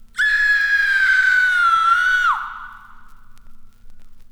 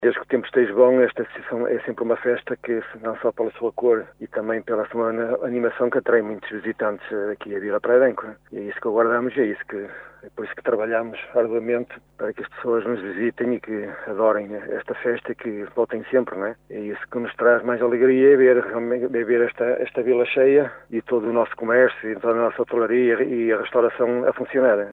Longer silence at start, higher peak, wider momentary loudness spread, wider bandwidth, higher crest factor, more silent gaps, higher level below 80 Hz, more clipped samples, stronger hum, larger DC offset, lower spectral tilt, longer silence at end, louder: first, 0.15 s vs 0 s; second, -6 dBFS vs -2 dBFS; second, 8 LU vs 13 LU; first, 19 kHz vs 4 kHz; second, 12 dB vs 18 dB; neither; first, -44 dBFS vs -64 dBFS; neither; neither; neither; second, 1.5 dB/octave vs -8.5 dB/octave; about the same, 0.1 s vs 0 s; first, -15 LUFS vs -22 LUFS